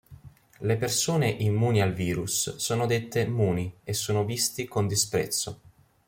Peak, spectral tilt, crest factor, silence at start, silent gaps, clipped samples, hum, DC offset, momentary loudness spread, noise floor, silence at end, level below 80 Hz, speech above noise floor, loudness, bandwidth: -10 dBFS; -4.5 dB/octave; 16 dB; 0.1 s; none; under 0.1%; none; under 0.1%; 6 LU; -50 dBFS; 0.4 s; -58 dBFS; 23 dB; -27 LUFS; 16.5 kHz